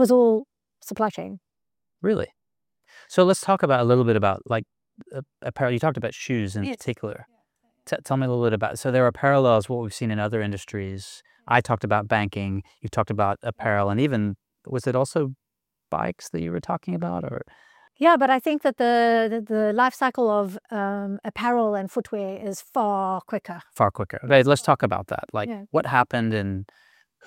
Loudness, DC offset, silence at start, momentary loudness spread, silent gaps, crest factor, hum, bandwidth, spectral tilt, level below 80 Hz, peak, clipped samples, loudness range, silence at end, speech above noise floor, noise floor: -23 LUFS; under 0.1%; 0 s; 13 LU; none; 20 dB; none; 16.5 kHz; -6 dB/octave; -62 dBFS; -4 dBFS; under 0.1%; 5 LU; 0.65 s; 64 dB; -87 dBFS